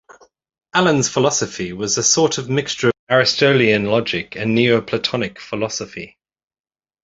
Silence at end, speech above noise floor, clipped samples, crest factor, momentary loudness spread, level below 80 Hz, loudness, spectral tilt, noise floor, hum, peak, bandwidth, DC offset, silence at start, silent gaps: 0.95 s; 31 dB; under 0.1%; 18 dB; 11 LU; -54 dBFS; -17 LUFS; -3.5 dB/octave; -48 dBFS; none; 0 dBFS; 8 kHz; under 0.1%; 0.75 s; 2.99-3.07 s